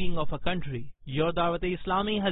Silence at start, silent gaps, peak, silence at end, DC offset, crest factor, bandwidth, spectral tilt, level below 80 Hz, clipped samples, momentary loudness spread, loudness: 0 s; none; -10 dBFS; 0 s; under 0.1%; 16 dB; 4 kHz; -10 dB/octave; -44 dBFS; under 0.1%; 9 LU; -30 LUFS